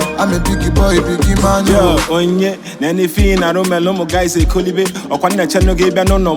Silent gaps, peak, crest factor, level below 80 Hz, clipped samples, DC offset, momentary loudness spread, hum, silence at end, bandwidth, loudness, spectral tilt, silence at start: none; 0 dBFS; 12 dB; -20 dBFS; under 0.1%; under 0.1%; 5 LU; none; 0 s; 20 kHz; -13 LUFS; -5.5 dB/octave; 0 s